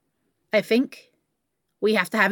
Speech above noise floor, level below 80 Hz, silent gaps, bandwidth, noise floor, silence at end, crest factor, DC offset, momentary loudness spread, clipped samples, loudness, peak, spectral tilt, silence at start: 56 dB; -78 dBFS; none; 17.5 kHz; -77 dBFS; 0 s; 20 dB; under 0.1%; 6 LU; under 0.1%; -23 LUFS; -4 dBFS; -5 dB/octave; 0.55 s